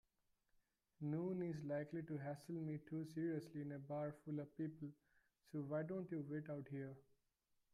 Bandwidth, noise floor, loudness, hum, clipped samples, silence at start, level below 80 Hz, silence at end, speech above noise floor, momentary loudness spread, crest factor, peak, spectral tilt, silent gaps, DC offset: 12 kHz; -85 dBFS; -48 LUFS; none; under 0.1%; 1 s; -84 dBFS; 0.7 s; 38 dB; 6 LU; 14 dB; -34 dBFS; -9 dB/octave; none; under 0.1%